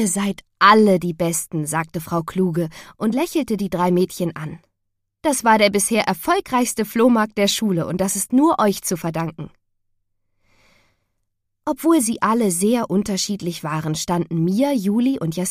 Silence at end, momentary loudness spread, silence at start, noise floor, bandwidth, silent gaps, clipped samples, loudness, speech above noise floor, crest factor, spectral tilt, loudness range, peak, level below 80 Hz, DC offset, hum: 0 s; 10 LU; 0 s; -75 dBFS; 15.5 kHz; none; under 0.1%; -19 LUFS; 56 dB; 20 dB; -4.5 dB/octave; 5 LU; 0 dBFS; -54 dBFS; under 0.1%; none